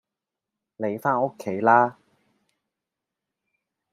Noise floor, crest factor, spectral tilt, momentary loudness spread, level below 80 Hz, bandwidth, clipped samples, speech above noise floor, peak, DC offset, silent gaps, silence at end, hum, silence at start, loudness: -87 dBFS; 24 dB; -7.5 dB/octave; 11 LU; -76 dBFS; 14.5 kHz; under 0.1%; 65 dB; -4 dBFS; under 0.1%; none; 2 s; none; 0.8 s; -23 LUFS